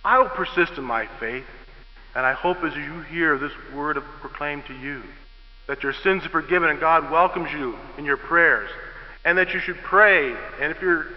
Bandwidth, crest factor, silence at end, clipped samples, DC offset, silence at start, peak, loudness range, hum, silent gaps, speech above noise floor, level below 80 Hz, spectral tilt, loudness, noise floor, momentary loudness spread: 6 kHz; 20 dB; 0 s; under 0.1%; under 0.1%; 0 s; -2 dBFS; 7 LU; none; none; 22 dB; -46 dBFS; -7.5 dB/octave; -22 LUFS; -44 dBFS; 16 LU